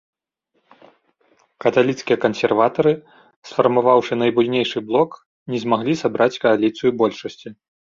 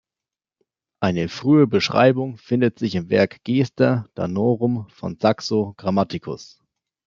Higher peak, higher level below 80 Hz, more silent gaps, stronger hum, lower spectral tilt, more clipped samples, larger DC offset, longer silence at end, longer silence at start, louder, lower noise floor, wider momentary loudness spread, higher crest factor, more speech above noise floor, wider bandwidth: about the same, -2 dBFS vs -2 dBFS; about the same, -62 dBFS vs -60 dBFS; first, 3.36-3.42 s, 5.26-5.46 s vs none; neither; about the same, -6 dB/octave vs -7 dB/octave; neither; neither; second, 0.4 s vs 0.65 s; first, 1.6 s vs 1 s; about the same, -19 LUFS vs -20 LUFS; second, -70 dBFS vs -89 dBFS; about the same, 11 LU vs 10 LU; about the same, 18 dB vs 18 dB; second, 52 dB vs 69 dB; about the same, 7.6 kHz vs 7.6 kHz